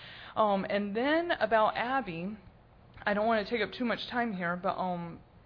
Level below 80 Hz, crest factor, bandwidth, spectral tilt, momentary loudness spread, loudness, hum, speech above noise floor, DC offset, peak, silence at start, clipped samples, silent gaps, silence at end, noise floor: -62 dBFS; 18 dB; 5.4 kHz; -7.5 dB/octave; 11 LU; -31 LUFS; none; 26 dB; under 0.1%; -14 dBFS; 0 s; under 0.1%; none; 0.25 s; -56 dBFS